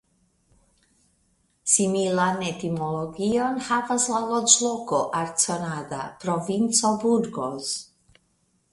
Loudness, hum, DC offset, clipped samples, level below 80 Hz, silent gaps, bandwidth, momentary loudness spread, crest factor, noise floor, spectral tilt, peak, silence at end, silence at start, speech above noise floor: -23 LUFS; none; under 0.1%; under 0.1%; -62 dBFS; none; 11.5 kHz; 11 LU; 24 dB; -68 dBFS; -3 dB/octave; -2 dBFS; 0.9 s; 1.65 s; 44 dB